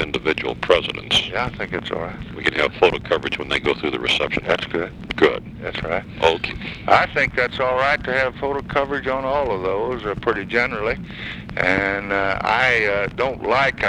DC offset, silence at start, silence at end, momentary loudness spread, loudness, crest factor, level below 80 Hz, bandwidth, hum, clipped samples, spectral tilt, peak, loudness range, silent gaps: under 0.1%; 0 s; 0 s; 9 LU; -20 LUFS; 20 dB; -42 dBFS; 12 kHz; none; under 0.1%; -4.5 dB/octave; 0 dBFS; 2 LU; none